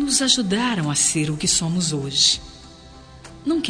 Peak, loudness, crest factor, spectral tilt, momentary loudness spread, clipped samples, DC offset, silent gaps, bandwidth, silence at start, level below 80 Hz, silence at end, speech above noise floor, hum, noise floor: -4 dBFS; -19 LUFS; 18 dB; -2.5 dB/octave; 7 LU; under 0.1%; under 0.1%; none; 10.5 kHz; 0 s; -48 dBFS; 0 s; 23 dB; none; -43 dBFS